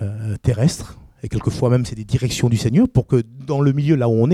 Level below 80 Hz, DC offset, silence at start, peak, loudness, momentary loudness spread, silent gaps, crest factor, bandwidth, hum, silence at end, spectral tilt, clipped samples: -40 dBFS; under 0.1%; 0 s; -4 dBFS; -19 LUFS; 9 LU; none; 14 dB; 14 kHz; none; 0 s; -7 dB/octave; under 0.1%